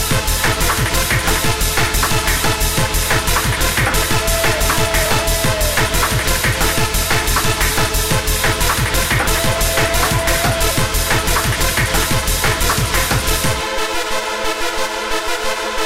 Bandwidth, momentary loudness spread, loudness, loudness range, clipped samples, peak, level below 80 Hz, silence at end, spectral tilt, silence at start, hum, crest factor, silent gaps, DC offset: 16.5 kHz; 4 LU; -15 LUFS; 1 LU; under 0.1%; -6 dBFS; -22 dBFS; 0 s; -3 dB/octave; 0 s; none; 10 dB; none; 3%